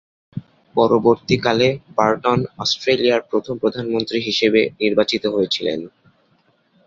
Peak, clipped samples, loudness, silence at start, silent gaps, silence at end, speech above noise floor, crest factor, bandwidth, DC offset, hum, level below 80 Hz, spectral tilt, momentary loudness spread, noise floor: -2 dBFS; under 0.1%; -18 LUFS; 0.35 s; none; 1 s; 42 dB; 18 dB; 7.8 kHz; under 0.1%; none; -54 dBFS; -5 dB/octave; 10 LU; -60 dBFS